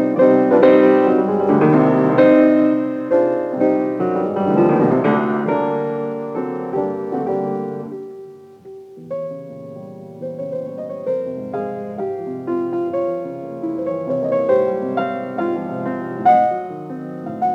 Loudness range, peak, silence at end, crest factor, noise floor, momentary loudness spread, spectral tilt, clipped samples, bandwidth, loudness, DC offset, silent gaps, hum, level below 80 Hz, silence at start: 13 LU; 0 dBFS; 0 s; 18 dB; -38 dBFS; 17 LU; -9.5 dB/octave; under 0.1%; 6.2 kHz; -18 LUFS; under 0.1%; none; none; -66 dBFS; 0 s